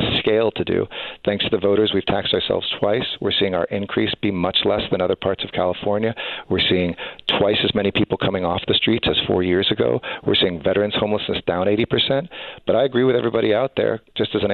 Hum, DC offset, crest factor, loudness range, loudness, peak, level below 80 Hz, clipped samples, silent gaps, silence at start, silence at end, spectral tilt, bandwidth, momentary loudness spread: none; under 0.1%; 16 dB; 2 LU; -20 LUFS; -4 dBFS; -48 dBFS; under 0.1%; none; 0 s; 0 s; -8.5 dB/octave; 4.8 kHz; 5 LU